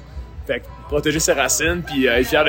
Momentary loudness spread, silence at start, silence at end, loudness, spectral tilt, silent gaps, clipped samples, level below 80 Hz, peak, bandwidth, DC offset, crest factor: 11 LU; 0 s; 0 s; -19 LUFS; -3 dB/octave; none; under 0.1%; -36 dBFS; -2 dBFS; 16.5 kHz; under 0.1%; 18 dB